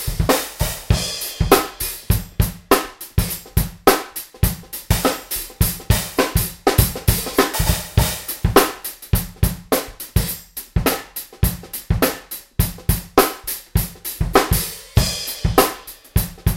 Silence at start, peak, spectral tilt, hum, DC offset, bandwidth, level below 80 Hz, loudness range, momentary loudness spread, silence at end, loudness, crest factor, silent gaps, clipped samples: 0 s; 0 dBFS; -4.5 dB/octave; none; under 0.1%; 17 kHz; -26 dBFS; 4 LU; 9 LU; 0 s; -20 LUFS; 20 dB; none; under 0.1%